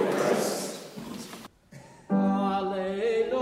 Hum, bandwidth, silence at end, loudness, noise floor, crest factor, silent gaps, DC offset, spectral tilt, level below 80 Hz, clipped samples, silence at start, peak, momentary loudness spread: none; 16 kHz; 0 s; -28 LUFS; -51 dBFS; 16 dB; none; under 0.1%; -5.5 dB/octave; -64 dBFS; under 0.1%; 0 s; -14 dBFS; 18 LU